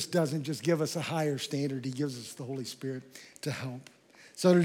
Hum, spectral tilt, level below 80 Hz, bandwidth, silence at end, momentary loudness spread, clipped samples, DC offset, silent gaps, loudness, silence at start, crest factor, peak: none; -5.5 dB/octave; -86 dBFS; 17 kHz; 0 s; 12 LU; under 0.1%; under 0.1%; none; -33 LUFS; 0 s; 20 dB; -12 dBFS